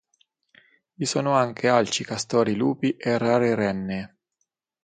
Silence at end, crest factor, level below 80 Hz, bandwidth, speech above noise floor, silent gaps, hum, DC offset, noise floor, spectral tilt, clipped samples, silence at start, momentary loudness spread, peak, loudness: 0.75 s; 20 dB; -62 dBFS; 9.4 kHz; 55 dB; none; none; under 0.1%; -78 dBFS; -5 dB/octave; under 0.1%; 1 s; 9 LU; -6 dBFS; -23 LUFS